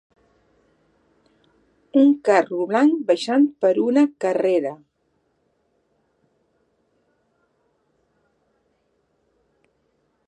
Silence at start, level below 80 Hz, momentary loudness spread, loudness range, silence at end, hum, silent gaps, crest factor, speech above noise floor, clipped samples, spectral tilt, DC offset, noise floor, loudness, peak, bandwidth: 1.95 s; -76 dBFS; 6 LU; 9 LU; 5.55 s; none; none; 20 dB; 51 dB; under 0.1%; -5.5 dB/octave; under 0.1%; -69 dBFS; -19 LUFS; -4 dBFS; 9.8 kHz